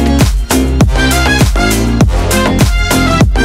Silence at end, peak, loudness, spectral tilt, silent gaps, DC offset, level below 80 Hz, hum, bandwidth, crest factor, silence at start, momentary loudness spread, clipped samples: 0 s; 0 dBFS; -10 LUFS; -5 dB/octave; none; under 0.1%; -14 dBFS; none; 16.5 kHz; 10 dB; 0 s; 2 LU; under 0.1%